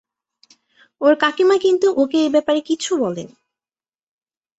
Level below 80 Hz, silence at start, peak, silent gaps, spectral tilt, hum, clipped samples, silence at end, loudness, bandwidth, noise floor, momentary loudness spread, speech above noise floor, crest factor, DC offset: -64 dBFS; 1 s; -2 dBFS; none; -4 dB/octave; none; under 0.1%; 1.3 s; -17 LUFS; 8.2 kHz; under -90 dBFS; 6 LU; over 73 dB; 18 dB; under 0.1%